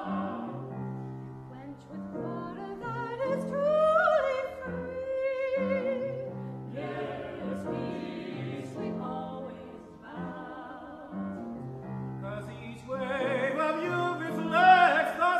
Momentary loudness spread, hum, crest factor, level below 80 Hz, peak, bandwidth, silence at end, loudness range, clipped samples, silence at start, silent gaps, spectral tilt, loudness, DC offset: 18 LU; none; 22 dB; -64 dBFS; -8 dBFS; 13.5 kHz; 0 s; 11 LU; under 0.1%; 0 s; none; -6.5 dB/octave; -30 LUFS; under 0.1%